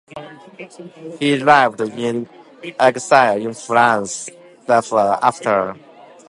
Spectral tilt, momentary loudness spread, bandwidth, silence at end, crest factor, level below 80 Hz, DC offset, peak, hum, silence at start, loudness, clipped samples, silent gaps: -4 dB/octave; 22 LU; 11.5 kHz; 0.5 s; 18 dB; -64 dBFS; under 0.1%; 0 dBFS; none; 0.1 s; -16 LUFS; under 0.1%; none